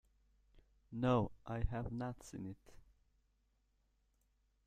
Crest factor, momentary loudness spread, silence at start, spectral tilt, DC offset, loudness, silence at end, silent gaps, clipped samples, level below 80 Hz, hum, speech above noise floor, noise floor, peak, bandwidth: 22 dB; 16 LU; 0.55 s; -7.5 dB/octave; under 0.1%; -41 LUFS; 1.9 s; none; under 0.1%; -54 dBFS; none; 39 dB; -78 dBFS; -22 dBFS; 10 kHz